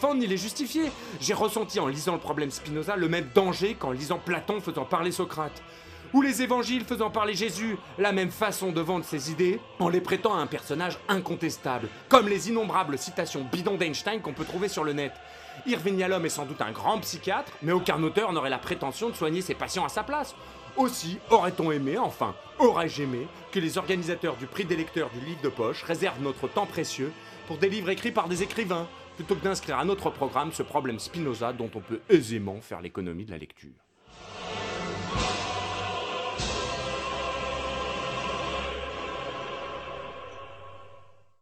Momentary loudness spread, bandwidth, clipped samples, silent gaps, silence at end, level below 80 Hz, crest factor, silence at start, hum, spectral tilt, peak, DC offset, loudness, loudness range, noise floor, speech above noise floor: 11 LU; 15.5 kHz; under 0.1%; none; 0.3 s; -54 dBFS; 28 dB; 0 s; none; -4.5 dB/octave; -2 dBFS; under 0.1%; -29 LUFS; 5 LU; -55 dBFS; 27 dB